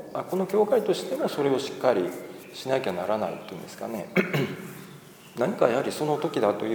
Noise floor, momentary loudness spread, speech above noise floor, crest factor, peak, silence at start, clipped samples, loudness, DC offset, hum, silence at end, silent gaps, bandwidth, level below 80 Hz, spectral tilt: -47 dBFS; 16 LU; 21 dB; 22 dB; -6 dBFS; 0 s; under 0.1%; -27 LUFS; under 0.1%; none; 0 s; none; over 20 kHz; -72 dBFS; -5.5 dB/octave